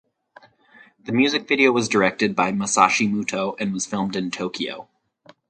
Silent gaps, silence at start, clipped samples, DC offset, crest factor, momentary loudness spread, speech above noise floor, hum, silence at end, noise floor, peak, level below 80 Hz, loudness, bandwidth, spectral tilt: none; 1.05 s; under 0.1%; under 0.1%; 22 dB; 10 LU; 33 dB; none; 0.65 s; -54 dBFS; 0 dBFS; -62 dBFS; -21 LUFS; 9.4 kHz; -3.5 dB/octave